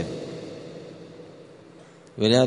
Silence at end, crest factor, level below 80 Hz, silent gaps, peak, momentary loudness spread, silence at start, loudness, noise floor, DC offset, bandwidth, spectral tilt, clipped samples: 0 s; 22 dB; -62 dBFS; none; -6 dBFS; 22 LU; 0 s; -29 LUFS; -49 dBFS; under 0.1%; 10.5 kHz; -5.5 dB/octave; under 0.1%